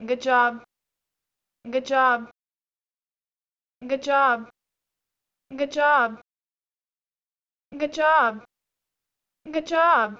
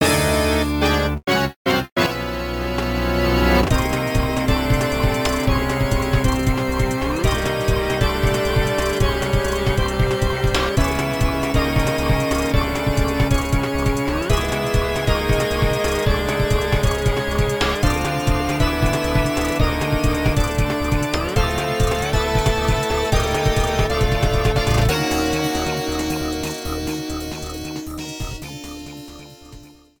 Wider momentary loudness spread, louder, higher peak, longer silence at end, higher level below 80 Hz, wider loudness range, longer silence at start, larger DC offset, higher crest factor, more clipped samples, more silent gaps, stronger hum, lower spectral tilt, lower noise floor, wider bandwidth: first, 12 LU vs 6 LU; about the same, -22 LUFS vs -20 LUFS; second, -8 dBFS vs -4 dBFS; second, 0.05 s vs 0.3 s; second, -70 dBFS vs -26 dBFS; about the same, 4 LU vs 2 LU; about the same, 0 s vs 0 s; second, under 0.1% vs 0.4%; about the same, 18 dB vs 16 dB; neither; second, 2.31-2.35 s vs 1.56-1.65 s, 1.92-1.96 s; neither; second, -3.5 dB/octave vs -5 dB/octave; first, under -90 dBFS vs -43 dBFS; second, 7.8 kHz vs 19 kHz